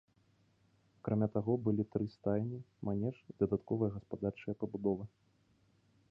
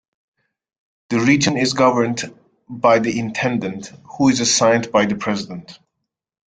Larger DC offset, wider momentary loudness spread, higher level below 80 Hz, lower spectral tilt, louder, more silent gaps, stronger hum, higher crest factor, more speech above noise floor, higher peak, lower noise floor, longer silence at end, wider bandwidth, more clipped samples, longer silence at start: neither; second, 8 LU vs 17 LU; second, -64 dBFS vs -58 dBFS; first, -11.5 dB/octave vs -4 dB/octave; second, -37 LUFS vs -17 LUFS; neither; neither; about the same, 20 dB vs 18 dB; second, 36 dB vs 61 dB; second, -18 dBFS vs -2 dBFS; second, -72 dBFS vs -78 dBFS; first, 1.05 s vs 0.7 s; second, 5.4 kHz vs 9.6 kHz; neither; about the same, 1.05 s vs 1.1 s